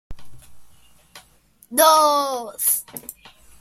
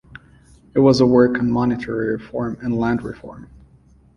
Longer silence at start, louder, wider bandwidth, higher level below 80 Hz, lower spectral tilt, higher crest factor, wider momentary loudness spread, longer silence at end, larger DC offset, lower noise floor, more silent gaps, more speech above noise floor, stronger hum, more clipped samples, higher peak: about the same, 0.1 s vs 0.15 s; about the same, -18 LUFS vs -18 LUFS; first, 16.5 kHz vs 8.8 kHz; second, -52 dBFS vs -46 dBFS; second, -0.5 dB/octave vs -7.5 dB/octave; about the same, 22 dB vs 18 dB; first, 22 LU vs 14 LU; second, 0.5 s vs 0.7 s; neither; first, -55 dBFS vs -51 dBFS; neither; first, 37 dB vs 33 dB; neither; neither; about the same, -2 dBFS vs -2 dBFS